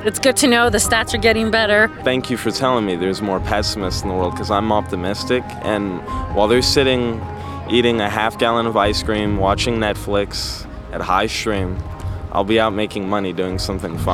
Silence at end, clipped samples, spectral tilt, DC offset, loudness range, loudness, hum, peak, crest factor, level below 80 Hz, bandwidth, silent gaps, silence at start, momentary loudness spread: 0 s; under 0.1%; -4 dB/octave; under 0.1%; 4 LU; -18 LUFS; none; 0 dBFS; 18 dB; -34 dBFS; 18 kHz; none; 0 s; 9 LU